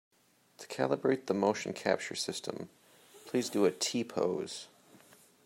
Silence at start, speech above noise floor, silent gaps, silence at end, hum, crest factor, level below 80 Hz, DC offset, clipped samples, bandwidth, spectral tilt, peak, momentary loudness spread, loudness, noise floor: 0.6 s; 29 dB; none; 0.5 s; none; 22 dB; -80 dBFS; under 0.1%; under 0.1%; 16 kHz; -4 dB/octave; -12 dBFS; 16 LU; -33 LUFS; -61 dBFS